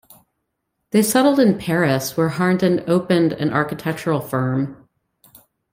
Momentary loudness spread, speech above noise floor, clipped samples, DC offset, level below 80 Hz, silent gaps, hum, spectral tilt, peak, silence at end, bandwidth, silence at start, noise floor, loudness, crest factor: 8 LU; 57 dB; under 0.1%; under 0.1%; -58 dBFS; none; none; -5.5 dB/octave; -2 dBFS; 1 s; 16.5 kHz; 0.95 s; -75 dBFS; -19 LUFS; 16 dB